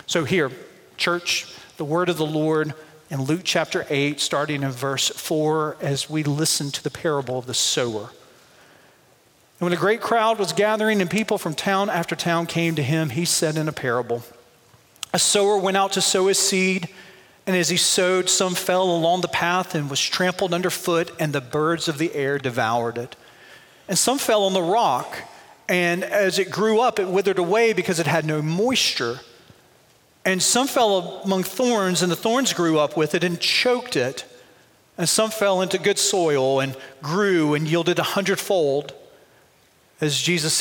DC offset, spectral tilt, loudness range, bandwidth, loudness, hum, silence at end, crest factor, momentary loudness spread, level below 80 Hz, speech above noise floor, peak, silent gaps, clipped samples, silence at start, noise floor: under 0.1%; -3.5 dB/octave; 4 LU; 17 kHz; -21 LUFS; none; 0 s; 18 dB; 8 LU; -66 dBFS; 36 dB; -4 dBFS; none; under 0.1%; 0.1 s; -57 dBFS